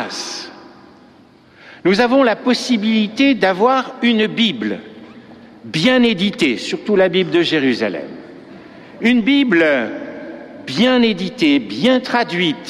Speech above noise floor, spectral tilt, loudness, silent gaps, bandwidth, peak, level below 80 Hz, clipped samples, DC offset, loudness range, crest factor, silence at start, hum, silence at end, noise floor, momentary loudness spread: 32 dB; -5 dB/octave; -16 LUFS; none; 11.5 kHz; -2 dBFS; -56 dBFS; under 0.1%; under 0.1%; 2 LU; 14 dB; 0 s; none; 0 s; -47 dBFS; 15 LU